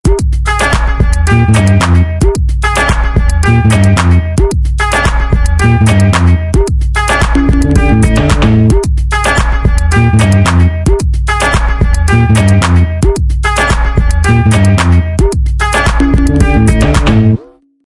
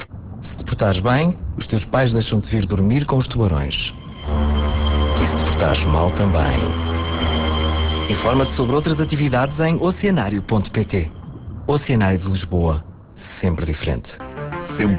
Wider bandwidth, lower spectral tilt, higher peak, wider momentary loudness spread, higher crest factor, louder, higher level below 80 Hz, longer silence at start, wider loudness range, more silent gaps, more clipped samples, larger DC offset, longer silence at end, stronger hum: first, 11.5 kHz vs 4 kHz; second, -6 dB/octave vs -11 dB/octave; first, 0 dBFS vs -6 dBFS; second, 4 LU vs 10 LU; second, 8 dB vs 14 dB; first, -10 LUFS vs -20 LUFS; first, -12 dBFS vs -26 dBFS; about the same, 0.05 s vs 0 s; about the same, 1 LU vs 3 LU; neither; first, 0.2% vs under 0.1%; neither; first, 0.45 s vs 0 s; neither